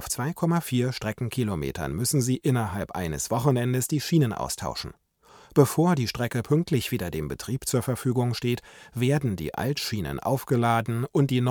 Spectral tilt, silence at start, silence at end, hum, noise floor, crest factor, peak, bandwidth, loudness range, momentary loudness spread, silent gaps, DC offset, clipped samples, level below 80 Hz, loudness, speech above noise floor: -5.5 dB/octave; 0 s; 0 s; none; -54 dBFS; 20 dB; -6 dBFS; 19.5 kHz; 2 LU; 7 LU; none; under 0.1%; under 0.1%; -50 dBFS; -26 LUFS; 29 dB